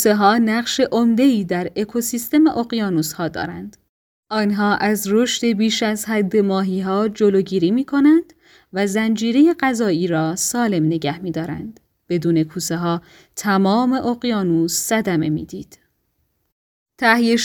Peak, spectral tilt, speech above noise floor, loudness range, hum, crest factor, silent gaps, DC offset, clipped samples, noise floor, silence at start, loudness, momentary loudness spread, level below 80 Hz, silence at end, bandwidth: 0 dBFS; -4.5 dB/octave; 50 dB; 4 LU; none; 18 dB; 3.89-4.23 s, 16.52-16.86 s; under 0.1%; under 0.1%; -68 dBFS; 0 s; -18 LUFS; 10 LU; -56 dBFS; 0 s; 19.5 kHz